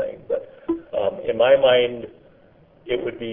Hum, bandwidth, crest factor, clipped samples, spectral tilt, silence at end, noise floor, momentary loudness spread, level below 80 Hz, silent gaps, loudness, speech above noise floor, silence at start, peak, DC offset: none; 3.8 kHz; 18 dB; under 0.1%; -8.5 dB/octave; 0 s; -53 dBFS; 14 LU; -56 dBFS; none; -21 LUFS; 34 dB; 0 s; -4 dBFS; under 0.1%